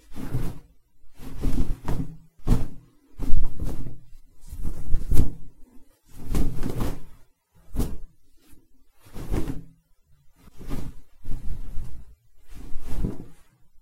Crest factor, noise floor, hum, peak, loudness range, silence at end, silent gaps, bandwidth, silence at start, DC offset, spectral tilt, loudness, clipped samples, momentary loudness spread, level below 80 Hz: 20 dB; -57 dBFS; none; 0 dBFS; 7 LU; 0.5 s; none; 4 kHz; 0.1 s; under 0.1%; -7 dB/octave; -33 LUFS; under 0.1%; 21 LU; -28 dBFS